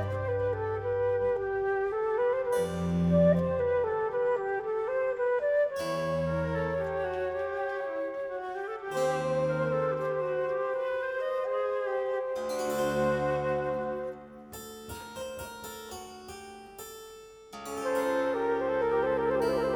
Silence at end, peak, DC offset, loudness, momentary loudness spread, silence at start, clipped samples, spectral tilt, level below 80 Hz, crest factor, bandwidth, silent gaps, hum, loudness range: 0 s; -14 dBFS; under 0.1%; -30 LUFS; 15 LU; 0 s; under 0.1%; -6.5 dB/octave; -54 dBFS; 16 dB; 19 kHz; none; none; 9 LU